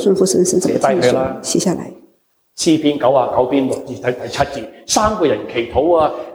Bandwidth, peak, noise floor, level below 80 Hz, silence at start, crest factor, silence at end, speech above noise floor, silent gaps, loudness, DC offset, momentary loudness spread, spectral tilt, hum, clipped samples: over 20 kHz; -2 dBFS; -59 dBFS; -42 dBFS; 0 s; 14 dB; 0 s; 43 dB; none; -16 LUFS; under 0.1%; 8 LU; -4.5 dB/octave; none; under 0.1%